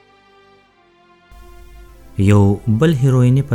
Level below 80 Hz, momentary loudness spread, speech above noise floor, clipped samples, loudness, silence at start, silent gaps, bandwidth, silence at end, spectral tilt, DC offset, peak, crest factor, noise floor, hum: -42 dBFS; 5 LU; 40 dB; under 0.1%; -14 LUFS; 2.15 s; none; 12.5 kHz; 0 s; -8 dB/octave; under 0.1%; -2 dBFS; 16 dB; -52 dBFS; none